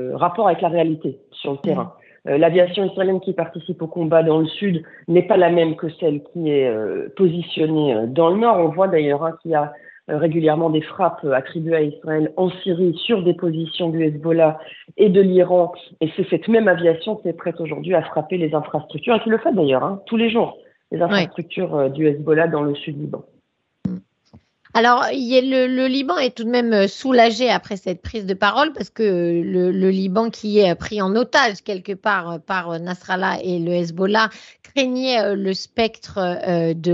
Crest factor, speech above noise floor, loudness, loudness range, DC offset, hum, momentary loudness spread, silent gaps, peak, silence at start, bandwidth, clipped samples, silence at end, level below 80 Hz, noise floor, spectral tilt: 18 dB; 45 dB; -19 LUFS; 3 LU; under 0.1%; none; 11 LU; none; 0 dBFS; 0 s; 7.8 kHz; under 0.1%; 0 s; -58 dBFS; -64 dBFS; -6.5 dB/octave